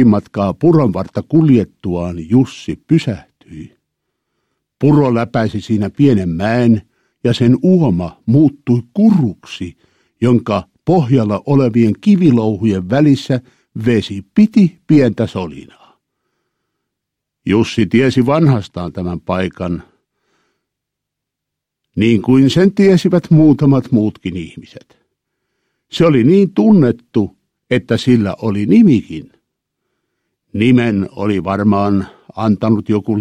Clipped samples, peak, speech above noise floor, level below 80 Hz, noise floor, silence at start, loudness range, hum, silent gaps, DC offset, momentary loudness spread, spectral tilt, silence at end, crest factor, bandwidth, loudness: under 0.1%; 0 dBFS; 67 dB; -46 dBFS; -79 dBFS; 0 s; 5 LU; none; none; under 0.1%; 13 LU; -8 dB/octave; 0 s; 14 dB; 9.8 kHz; -13 LUFS